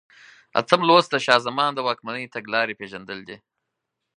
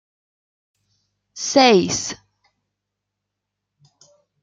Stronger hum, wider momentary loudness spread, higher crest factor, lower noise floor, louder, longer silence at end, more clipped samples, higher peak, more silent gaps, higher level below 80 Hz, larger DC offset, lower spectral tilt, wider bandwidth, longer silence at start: second, none vs 50 Hz at -55 dBFS; about the same, 18 LU vs 16 LU; about the same, 24 dB vs 22 dB; about the same, -81 dBFS vs -81 dBFS; second, -21 LUFS vs -17 LUFS; second, 0.8 s vs 2.3 s; neither; about the same, 0 dBFS vs -2 dBFS; neither; second, -70 dBFS vs -62 dBFS; neither; about the same, -4 dB/octave vs -3 dB/octave; about the same, 10.5 kHz vs 9.6 kHz; second, 0.55 s vs 1.35 s